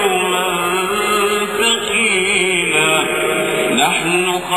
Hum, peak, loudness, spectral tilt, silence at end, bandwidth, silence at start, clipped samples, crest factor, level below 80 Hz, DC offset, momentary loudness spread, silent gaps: none; 0 dBFS; -14 LUFS; -2 dB/octave; 0 s; 16 kHz; 0 s; under 0.1%; 14 dB; -52 dBFS; 0.3%; 3 LU; none